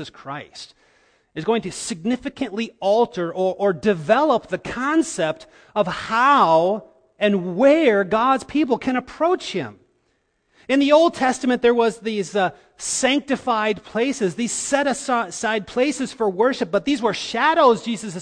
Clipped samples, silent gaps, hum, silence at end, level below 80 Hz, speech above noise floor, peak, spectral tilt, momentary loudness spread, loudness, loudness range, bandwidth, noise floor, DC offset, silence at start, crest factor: under 0.1%; none; none; 0 s; -56 dBFS; 48 dB; -4 dBFS; -4 dB/octave; 12 LU; -20 LUFS; 4 LU; 10.5 kHz; -68 dBFS; under 0.1%; 0 s; 16 dB